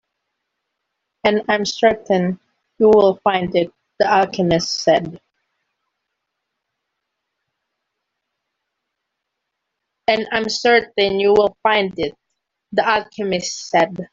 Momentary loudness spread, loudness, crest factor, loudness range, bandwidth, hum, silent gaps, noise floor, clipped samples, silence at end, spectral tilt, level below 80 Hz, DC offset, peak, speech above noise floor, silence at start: 9 LU; -17 LUFS; 18 dB; 8 LU; 7.8 kHz; none; none; -78 dBFS; under 0.1%; 0.05 s; -4.5 dB/octave; -54 dBFS; under 0.1%; -2 dBFS; 62 dB; 1.25 s